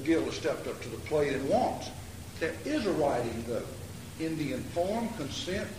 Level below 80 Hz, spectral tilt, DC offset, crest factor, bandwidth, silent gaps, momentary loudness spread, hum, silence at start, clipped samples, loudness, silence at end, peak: -52 dBFS; -5 dB/octave; 0.2%; 16 dB; 15.5 kHz; none; 12 LU; none; 0 s; under 0.1%; -32 LUFS; 0 s; -16 dBFS